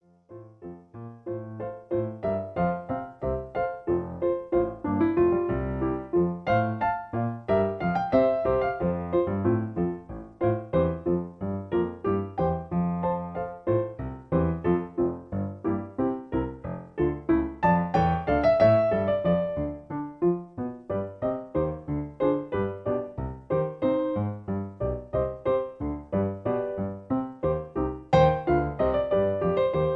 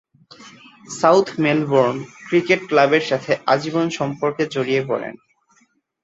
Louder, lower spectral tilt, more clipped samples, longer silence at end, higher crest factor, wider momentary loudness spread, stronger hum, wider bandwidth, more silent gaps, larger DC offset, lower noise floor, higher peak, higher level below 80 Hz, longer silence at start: second, -27 LUFS vs -19 LUFS; first, -9.5 dB/octave vs -5.5 dB/octave; neither; second, 0 s vs 0.9 s; about the same, 20 dB vs 18 dB; about the same, 11 LU vs 9 LU; neither; second, 6 kHz vs 8 kHz; neither; neither; second, -48 dBFS vs -61 dBFS; second, -8 dBFS vs -2 dBFS; first, -44 dBFS vs -64 dBFS; about the same, 0.3 s vs 0.4 s